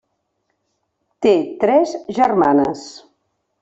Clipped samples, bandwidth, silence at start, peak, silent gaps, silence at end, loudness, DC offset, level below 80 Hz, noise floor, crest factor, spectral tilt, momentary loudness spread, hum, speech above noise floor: under 0.1%; 8 kHz; 1.2 s; -2 dBFS; none; 0.65 s; -16 LUFS; under 0.1%; -58 dBFS; -71 dBFS; 16 dB; -6 dB/octave; 9 LU; none; 55 dB